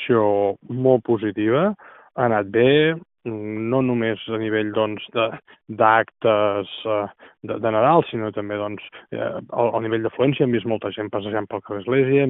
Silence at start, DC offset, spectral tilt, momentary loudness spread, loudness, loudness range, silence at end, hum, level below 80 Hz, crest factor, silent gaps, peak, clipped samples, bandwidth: 0 s; under 0.1%; -5 dB/octave; 13 LU; -21 LUFS; 3 LU; 0 s; none; -64 dBFS; 20 dB; none; -2 dBFS; under 0.1%; 4 kHz